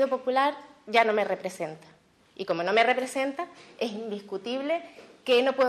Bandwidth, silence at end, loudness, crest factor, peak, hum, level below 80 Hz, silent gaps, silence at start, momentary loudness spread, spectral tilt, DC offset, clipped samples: 13 kHz; 0 s; -27 LUFS; 20 dB; -6 dBFS; none; -78 dBFS; none; 0 s; 15 LU; -4 dB/octave; under 0.1%; under 0.1%